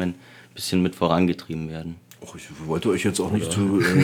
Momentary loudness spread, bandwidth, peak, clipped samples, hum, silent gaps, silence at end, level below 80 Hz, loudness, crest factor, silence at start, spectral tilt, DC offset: 20 LU; 18 kHz; -4 dBFS; under 0.1%; none; none; 0 s; -52 dBFS; -23 LUFS; 20 dB; 0 s; -5.5 dB/octave; under 0.1%